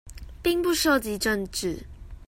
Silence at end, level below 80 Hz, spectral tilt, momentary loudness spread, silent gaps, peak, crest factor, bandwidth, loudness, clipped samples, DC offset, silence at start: 0.05 s; -44 dBFS; -3.5 dB/octave; 18 LU; none; -10 dBFS; 18 dB; 16.5 kHz; -25 LUFS; under 0.1%; under 0.1%; 0.05 s